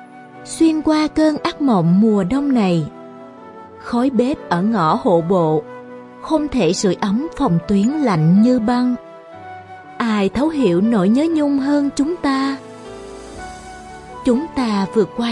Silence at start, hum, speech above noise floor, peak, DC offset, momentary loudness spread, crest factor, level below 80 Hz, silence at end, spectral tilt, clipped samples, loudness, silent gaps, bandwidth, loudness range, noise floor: 0 s; none; 22 dB; -4 dBFS; under 0.1%; 21 LU; 14 dB; -46 dBFS; 0 s; -6.5 dB/octave; under 0.1%; -17 LUFS; none; 11.5 kHz; 3 LU; -37 dBFS